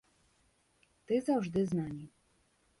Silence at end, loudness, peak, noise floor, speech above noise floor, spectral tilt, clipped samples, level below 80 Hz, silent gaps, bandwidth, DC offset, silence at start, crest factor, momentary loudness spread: 0.7 s; -34 LUFS; -20 dBFS; -72 dBFS; 39 dB; -7.5 dB/octave; under 0.1%; -66 dBFS; none; 11.5 kHz; under 0.1%; 1.1 s; 18 dB; 15 LU